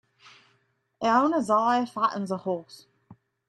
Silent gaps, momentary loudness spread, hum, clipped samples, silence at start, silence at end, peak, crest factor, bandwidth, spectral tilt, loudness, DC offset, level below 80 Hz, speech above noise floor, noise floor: none; 9 LU; none; under 0.1%; 1 s; 0.35 s; -10 dBFS; 18 dB; 12 kHz; -5.5 dB/octave; -25 LUFS; under 0.1%; -74 dBFS; 45 dB; -70 dBFS